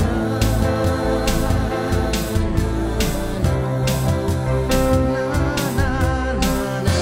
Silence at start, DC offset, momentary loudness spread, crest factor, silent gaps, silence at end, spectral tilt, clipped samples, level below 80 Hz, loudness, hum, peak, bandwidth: 0 s; under 0.1%; 3 LU; 14 dB; none; 0 s; -6 dB/octave; under 0.1%; -26 dBFS; -20 LUFS; none; -4 dBFS; 16.5 kHz